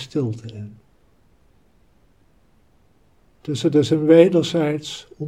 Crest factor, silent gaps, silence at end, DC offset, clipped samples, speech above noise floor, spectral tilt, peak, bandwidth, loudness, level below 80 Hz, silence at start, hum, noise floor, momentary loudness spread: 22 dB; none; 0 s; 0.1%; under 0.1%; 40 dB; -6.5 dB/octave; 0 dBFS; 11 kHz; -18 LUFS; -60 dBFS; 0 s; none; -59 dBFS; 23 LU